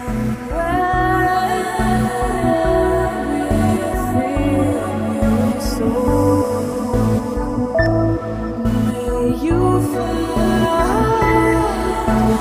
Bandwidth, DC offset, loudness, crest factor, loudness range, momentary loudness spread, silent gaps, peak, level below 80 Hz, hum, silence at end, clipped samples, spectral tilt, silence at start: 16 kHz; under 0.1%; -18 LUFS; 14 dB; 2 LU; 5 LU; none; -2 dBFS; -28 dBFS; none; 0 s; under 0.1%; -6.5 dB/octave; 0 s